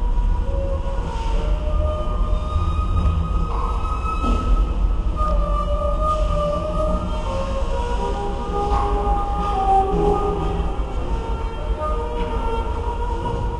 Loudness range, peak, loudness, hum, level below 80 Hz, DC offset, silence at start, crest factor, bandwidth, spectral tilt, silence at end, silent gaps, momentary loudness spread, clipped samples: 2 LU; -6 dBFS; -23 LUFS; none; -22 dBFS; under 0.1%; 0 s; 14 dB; 8.8 kHz; -7.5 dB/octave; 0 s; none; 5 LU; under 0.1%